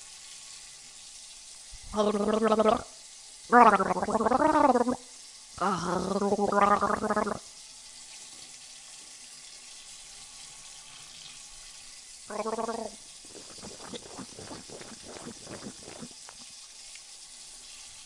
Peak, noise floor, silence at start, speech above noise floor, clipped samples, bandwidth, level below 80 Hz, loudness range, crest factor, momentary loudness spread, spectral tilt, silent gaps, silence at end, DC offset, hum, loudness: -6 dBFS; -48 dBFS; 0 s; 23 dB; under 0.1%; 11.5 kHz; -60 dBFS; 19 LU; 26 dB; 21 LU; -4 dB/octave; none; 0 s; under 0.1%; none; -26 LUFS